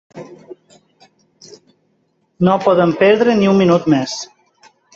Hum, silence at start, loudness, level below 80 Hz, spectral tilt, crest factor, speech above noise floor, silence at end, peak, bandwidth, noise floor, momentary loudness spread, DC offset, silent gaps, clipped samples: none; 0.15 s; -13 LUFS; -56 dBFS; -6.5 dB/octave; 16 dB; 50 dB; 0.7 s; -2 dBFS; 7.8 kHz; -63 dBFS; 23 LU; under 0.1%; none; under 0.1%